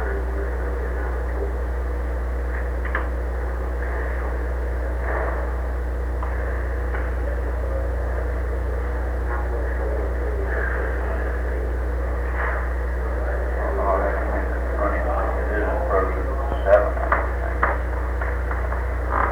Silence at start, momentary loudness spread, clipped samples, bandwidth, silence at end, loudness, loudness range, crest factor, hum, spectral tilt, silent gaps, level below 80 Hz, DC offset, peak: 0 s; 5 LU; under 0.1%; 4.2 kHz; 0 s; -25 LUFS; 5 LU; 18 dB; 60 Hz at -25 dBFS; -8 dB/octave; none; -24 dBFS; under 0.1%; -4 dBFS